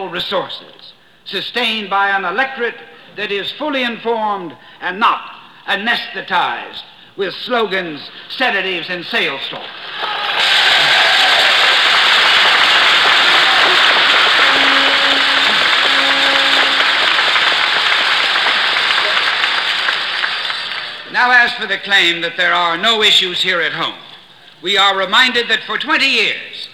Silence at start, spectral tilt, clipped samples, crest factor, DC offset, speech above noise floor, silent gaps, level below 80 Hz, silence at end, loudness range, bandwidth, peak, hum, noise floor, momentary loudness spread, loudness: 0 s; -1 dB/octave; under 0.1%; 14 dB; 0.2%; 24 dB; none; -58 dBFS; 0.05 s; 10 LU; 18 kHz; 0 dBFS; none; -40 dBFS; 14 LU; -12 LUFS